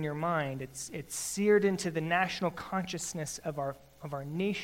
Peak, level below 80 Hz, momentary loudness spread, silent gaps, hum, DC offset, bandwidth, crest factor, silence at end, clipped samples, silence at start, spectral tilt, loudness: -14 dBFS; -64 dBFS; 13 LU; none; none; under 0.1%; 16 kHz; 18 dB; 0 s; under 0.1%; 0 s; -4.5 dB/octave; -32 LUFS